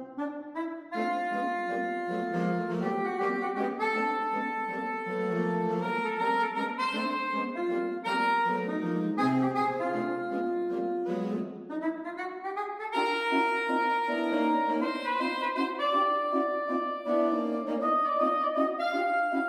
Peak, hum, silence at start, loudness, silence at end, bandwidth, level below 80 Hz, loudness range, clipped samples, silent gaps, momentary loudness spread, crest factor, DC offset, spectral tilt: -14 dBFS; none; 0 s; -29 LUFS; 0 s; 13.5 kHz; -78 dBFS; 3 LU; under 0.1%; none; 7 LU; 16 dB; under 0.1%; -6.5 dB/octave